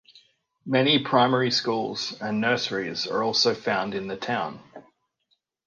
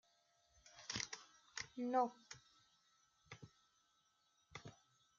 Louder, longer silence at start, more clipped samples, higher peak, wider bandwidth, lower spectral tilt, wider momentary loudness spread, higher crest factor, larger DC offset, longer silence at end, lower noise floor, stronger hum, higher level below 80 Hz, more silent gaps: first, -24 LUFS vs -45 LUFS; second, 0.15 s vs 0.65 s; neither; first, -6 dBFS vs -24 dBFS; first, 10 kHz vs 7.4 kHz; first, -4.5 dB/octave vs -2.5 dB/octave; second, 10 LU vs 22 LU; second, 20 dB vs 26 dB; neither; first, 0.85 s vs 0.45 s; second, -73 dBFS vs -80 dBFS; neither; first, -68 dBFS vs -80 dBFS; neither